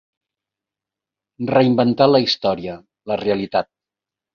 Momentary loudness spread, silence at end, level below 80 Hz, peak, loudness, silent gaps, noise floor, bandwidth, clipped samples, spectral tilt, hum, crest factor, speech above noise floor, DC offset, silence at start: 16 LU; 0.7 s; -58 dBFS; -2 dBFS; -18 LUFS; none; -88 dBFS; 6.8 kHz; under 0.1%; -7 dB/octave; none; 18 dB; 70 dB; under 0.1%; 1.4 s